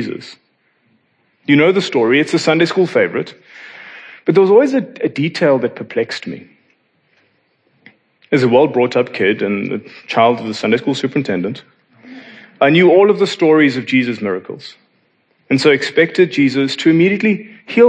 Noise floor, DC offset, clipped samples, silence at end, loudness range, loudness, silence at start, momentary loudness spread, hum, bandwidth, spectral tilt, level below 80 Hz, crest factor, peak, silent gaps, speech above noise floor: -60 dBFS; under 0.1%; under 0.1%; 0 s; 5 LU; -14 LUFS; 0 s; 16 LU; none; 9.8 kHz; -6 dB/octave; -68 dBFS; 16 dB; 0 dBFS; none; 46 dB